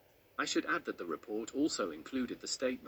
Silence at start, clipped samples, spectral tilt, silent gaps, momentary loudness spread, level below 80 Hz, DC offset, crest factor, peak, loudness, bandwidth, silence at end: 0.4 s; under 0.1%; -2.5 dB/octave; none; 7 LU; -72 dBFS; under 0.1%; 16 dB; -20 dBFS; -37 LUFS; over 20 kHz; 0 s